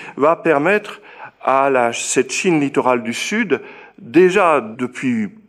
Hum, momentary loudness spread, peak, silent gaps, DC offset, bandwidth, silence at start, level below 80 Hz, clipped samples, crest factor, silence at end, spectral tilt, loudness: none; 9 LU; -2 dBFS; none; under 0.1%; 14 kHz; 0 s; -64 dBFS; under 0.1%; 16 dB; 0.2 s; -4.5 dB/octave; -17 LUFS